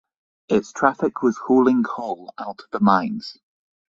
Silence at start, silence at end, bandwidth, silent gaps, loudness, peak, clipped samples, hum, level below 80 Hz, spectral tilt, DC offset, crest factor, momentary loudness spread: 0.5 s; 0.55 s; 7.6 kHz; none; -21 LUFS; 0 dBFS; under 0.1%; none; -62 dBFS; -6.5 dB/octave; under 0.1%; 20 dB; 15 LU